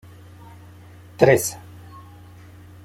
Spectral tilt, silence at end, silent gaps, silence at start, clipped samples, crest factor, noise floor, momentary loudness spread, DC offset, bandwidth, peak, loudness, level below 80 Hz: -5 dB/octave; 0.85 s; none; 1.2 s; under 0.1%; 22 dB; -44 dBFS; 27 LU; under 0.1%; 16.5 kHz; -2 dBFS; -18 LUFS; -56 dBFS